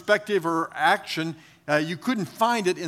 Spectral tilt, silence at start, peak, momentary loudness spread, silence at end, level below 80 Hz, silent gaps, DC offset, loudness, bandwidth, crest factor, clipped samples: -4.5 dB/octave; 0 s; -6 dBFS; 8 LU; 0 s; -74 dBFS; none; under 0.1%; -25 LUFS; 16 kHz; 20 dB; under 0.1%